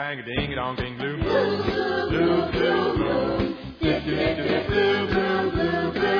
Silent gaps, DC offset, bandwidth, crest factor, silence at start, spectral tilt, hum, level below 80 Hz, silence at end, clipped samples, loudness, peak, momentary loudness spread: none; under 0.1%; 5.4 kHz; 14 dB; 0 s; -7.5 dB/octave; none; -40 dBFS; 0 s; under 0.1%; -24 LUFS; -8 dBFS; 6 LU